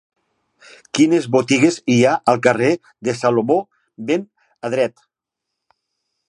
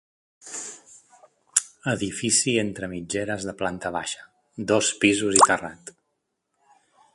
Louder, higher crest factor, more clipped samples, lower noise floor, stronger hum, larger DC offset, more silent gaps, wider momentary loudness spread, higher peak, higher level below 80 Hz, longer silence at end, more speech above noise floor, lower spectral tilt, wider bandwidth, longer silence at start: first, -17 LUFS vs -23 LUFS; second, 18 dB vs 26 dB; neither; first, -82 dBFS vs -77 dBFS; neither; neither; neither; second, 10 LU vs 19 LU; about the same, 0 dBFS vs 0 dBFS; second, -64 dBFS vs -58 dBFS; first, 1.4 s vs 1.25 s; first, 65 dB vs 54 dB; first, -5.5 dB/octave vs -2.5 dB/octave; about the same, 11.5 kHz vs 11.5 kHz; first, 0.95 s vs 0.45 s